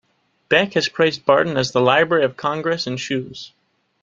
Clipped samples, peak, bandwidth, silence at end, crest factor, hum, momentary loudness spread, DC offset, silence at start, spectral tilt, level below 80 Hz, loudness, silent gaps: under 0.1%; 0 dBFS; 7.6 kHz; 0.55 s; 18 dB; none; 10 LU; under 0.1%; 0.5 s; -4.5 dB/octave; -58 dBFS; -18 LUFS; none